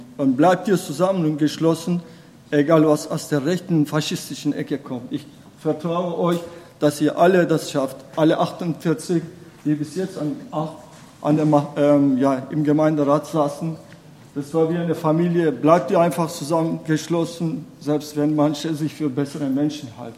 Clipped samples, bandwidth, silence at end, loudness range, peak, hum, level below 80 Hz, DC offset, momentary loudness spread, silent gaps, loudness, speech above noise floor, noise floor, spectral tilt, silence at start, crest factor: under 0.1%; 15 kHz; 0 s; 4 LU; 0 dBFS; none; -64 dBFS; under 0.1%; 11 LU; none; -21 LUFS; 24 dB; -44 dBFS; -6.5 dB/octave; 0 s; 20 dB